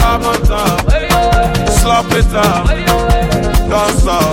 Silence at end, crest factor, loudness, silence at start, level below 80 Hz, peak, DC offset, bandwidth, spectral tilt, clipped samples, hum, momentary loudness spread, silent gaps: 0 s; 10 dB; -12 LUFS; 0 s; -16 dBFS; 0 dBFS; under 0.1%; 17 kHz; -5 dB/octave; under 0.1%; none; 2 LU; none